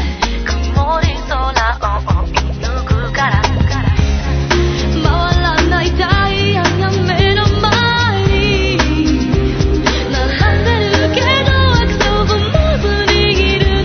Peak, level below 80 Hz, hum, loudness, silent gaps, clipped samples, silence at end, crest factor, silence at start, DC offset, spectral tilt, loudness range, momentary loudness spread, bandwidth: 0 dBFS; -18 dBFS; none; -13 LUFS; none; under 0.1%; 0 s; 12 dB; 0 s; under 0.1%; -5.5 dB/octave; 3 LU; 5 LU; 6.6 kHz